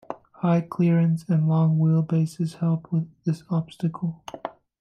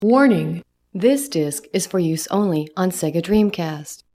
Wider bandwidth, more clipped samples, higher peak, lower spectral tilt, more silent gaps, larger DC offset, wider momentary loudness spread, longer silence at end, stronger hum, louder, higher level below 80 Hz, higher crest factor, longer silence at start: second, 9.2 kHz vs 16.5 kHz; neither; second, -12 dBFS vs -2 dBFS; first, -9 dB/octave vs -5.5 dB/octave; neither; neither; first, 14 LU vs 11 LU; about the same, 0.3 s vs 0.2 s; neither; second, -24 LUFS vs -20 LUFS; second, -66 dBFS vs -52 dBFS; about the same, 12 dB vs 16 dB; about the same, 0.1 s vs 0 s